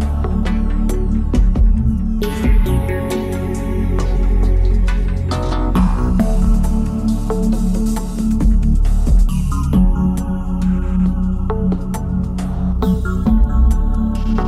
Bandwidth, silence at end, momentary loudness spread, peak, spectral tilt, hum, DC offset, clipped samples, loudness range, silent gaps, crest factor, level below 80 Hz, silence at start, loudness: 13 kHz; 0 s; 5 LU; -4 dBFS; -8 dB/octave; none; under 0.1%; under 0.1%; 1 LU; none; 10 dB; -16 dBFS; 0 s; -18 LUFS